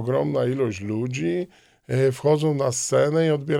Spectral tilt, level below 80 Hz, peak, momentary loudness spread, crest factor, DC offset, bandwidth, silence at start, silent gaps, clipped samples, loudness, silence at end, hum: -6 dB/octave; -62 dBFS; -8 dBFS; 7 LU; 14 dB; under 0.1%; 15.5 kHz; 0 s; none; under 0.1%; -23 LUFS; 0 s; none